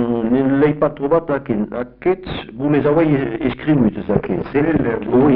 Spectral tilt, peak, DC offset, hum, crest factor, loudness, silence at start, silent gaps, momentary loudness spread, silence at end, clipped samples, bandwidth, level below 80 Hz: -7 dB/octave; -2 dBFS; under 0.1%; none; 14 dB; -18 LUFS; 0 s; none; 7 LU; 0 s; under 0.1%; 4.8 kHz; -40 dBFS